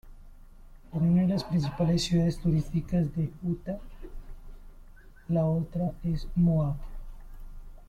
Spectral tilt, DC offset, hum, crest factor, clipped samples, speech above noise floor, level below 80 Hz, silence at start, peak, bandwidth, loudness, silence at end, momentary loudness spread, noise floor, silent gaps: -7.5 dB/octave; under 0.1%; none; 14 dB; under 0.1%; 22 dB; -42 dBFS; 0.05 s; -16 dBFS; 11 kHz; -28 LUFS; 0.05 s; 15 LU; -49 dBFS; none